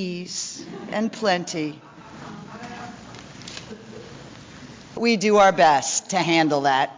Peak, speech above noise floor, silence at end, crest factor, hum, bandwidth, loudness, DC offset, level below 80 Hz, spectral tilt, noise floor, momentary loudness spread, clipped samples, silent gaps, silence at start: -6 dBFS; 22 dB; 0 s; 18 dB; none; 7.8 kHz; -21 LUFS; under 0.1%; -60 dBFS; -3.5 dB/octave; -42 dBFS; 25 LU; under 0.1%; none; 0 s